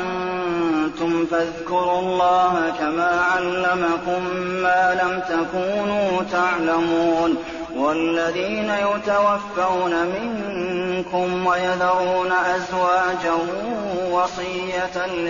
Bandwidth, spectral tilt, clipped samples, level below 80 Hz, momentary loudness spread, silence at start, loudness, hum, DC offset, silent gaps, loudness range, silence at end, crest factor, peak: 7.2 kHz; -3 dB/octave; under 0.1%; -52 dBFS; 6 LU; 0 s; -21 LUFS; none; 0.2%; none; 2 LU; 0 s; 12 dB; -8 dBFS